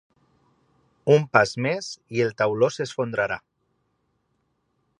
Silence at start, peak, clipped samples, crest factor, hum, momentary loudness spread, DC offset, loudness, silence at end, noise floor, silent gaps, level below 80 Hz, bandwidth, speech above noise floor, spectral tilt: 1.05 s; -2 dBFS; under 0.1%; 24 dB; none; 11 LU; under 0.1%; -23 LUFS; 1.6 s; -72 dBFS; none; -64 dBFS; 10.5 kHz; 50 dB; -5.5 dB/octave